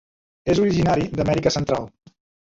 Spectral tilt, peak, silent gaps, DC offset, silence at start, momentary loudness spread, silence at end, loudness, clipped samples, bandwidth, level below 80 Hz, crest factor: -6 dB/octave; -6 dBFS; none; under 0.1%; 0.45 s; 9 LU; 0.55 s; -21 LUFS; under 0.1%; 7.8 kHz; -44 dBFS; 16 dB